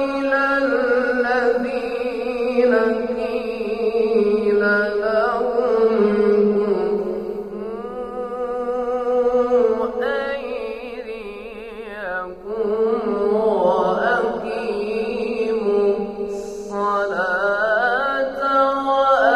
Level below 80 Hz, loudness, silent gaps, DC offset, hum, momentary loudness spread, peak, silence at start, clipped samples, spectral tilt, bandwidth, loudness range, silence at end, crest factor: -50 dBFS; -20 LUFS; none; under 0.1%; none; 12 LU; -4 dBFS; 0 s; under 0.1%; -6 dB/octave; 10 kHz; 4 LU; 0 s; 16 dB